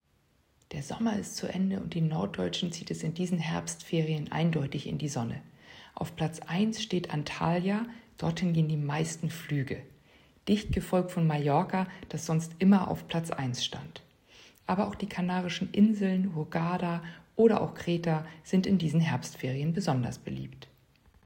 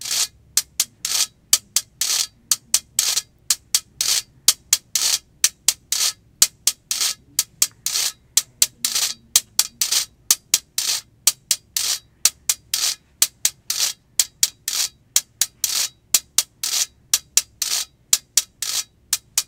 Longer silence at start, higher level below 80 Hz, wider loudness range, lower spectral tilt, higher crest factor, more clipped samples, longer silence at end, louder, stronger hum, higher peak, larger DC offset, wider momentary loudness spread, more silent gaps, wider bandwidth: first, 0.7 s vs 0 s; about the same, -56 dBFS vs -60 dBFS; about the same, 4 LU vs 2 LU; first, -6 dB/octave vs 3 dB/octave; about the same, 20 dB vs 22 dB; neither; first, 0.6 s vs 0.05 s; second, -30 LUFS vs -20 LUFS; neither; second, -10 dBFS vs 0 dBFS; neither; first, 13 LU vs 5 LU; neither; second, 16 kHz vs over 20 kHz